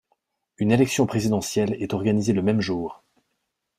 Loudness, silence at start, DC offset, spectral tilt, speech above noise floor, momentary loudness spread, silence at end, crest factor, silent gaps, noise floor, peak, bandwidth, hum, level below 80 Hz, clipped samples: -23 LUFS; 0.6 s; under 0.1%; -6 dB/octave; 55 dB; 7 LU; 0.85 s; 18 dB; none; -77 dBFS; -6 dBFS; 15.5 kHz; none; -56 dBFS; under 0.1%